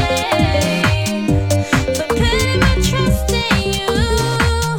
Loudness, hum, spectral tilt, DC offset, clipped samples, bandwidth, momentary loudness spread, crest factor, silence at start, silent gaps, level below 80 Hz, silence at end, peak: -16 LUFS; none; -5 dB/octave; under 0.1%; under 0.1%; 18.5 kHz; 3 LU; 16 dB; 0 s; none; -24 dBFS; 0 s; 0 dBFS